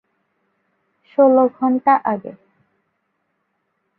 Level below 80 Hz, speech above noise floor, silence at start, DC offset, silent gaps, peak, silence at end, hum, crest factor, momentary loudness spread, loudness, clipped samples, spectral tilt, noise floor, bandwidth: -72 dBFS; 56 dB; 1.2 s; under 0.1%; none; -2 dBFS; 1.65 s; none; 18 dB; 13 LU; -16 LUFS; under 0.1%; -11 dB/octave; -71 dBFS; 4.3 kHz